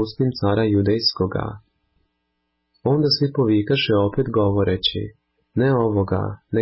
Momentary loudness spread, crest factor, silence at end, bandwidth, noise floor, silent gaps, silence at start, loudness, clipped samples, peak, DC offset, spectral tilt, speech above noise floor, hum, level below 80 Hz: 9 LU; 14 dB; 0 s; 5.8 kHz; -73 dBFS; none; 0 s; -20 LUFS; under 0.1%; -6 dBFS; under 0.1%; -10 dB/octave; 54 dB; none; -42 dBFS